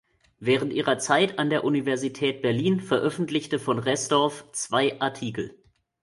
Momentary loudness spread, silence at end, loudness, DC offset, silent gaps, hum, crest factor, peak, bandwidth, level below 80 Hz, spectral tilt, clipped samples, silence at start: 9 LU; 0.5 s; -25 LUFS; under 0.1%; none; none; 20 dB; -6 dBFS; 11.5 kHz; -64 dBFS; -4.5 dB/octave; under 0.1%; 0.4 s